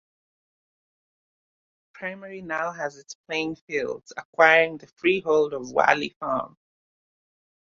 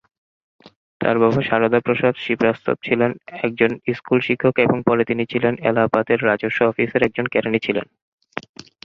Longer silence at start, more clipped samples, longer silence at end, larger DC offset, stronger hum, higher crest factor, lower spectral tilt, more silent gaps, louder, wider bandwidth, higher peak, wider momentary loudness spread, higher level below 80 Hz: first, 2 s vs 1 s; neither; first, 1.25 s vs 0.45 s; neither; neither; first, 24 dB vs 18 dB; second, -4 dB/octave vs -8 dB/octave; first, 3.15-3.24 s, 3.61-3.67 s, 4.25-4.33 s, 6.16-6.20 s vs 8.02-8.18 s; second, -24 LUFS vs -19 LUFS; about the same, 7.4 kHz vs 6.8 kHz; about the same, -2 dBFS vs 0 dBFS; first, 18 LU vs 8 LU; second, -68 dBFS vs -56 dBFS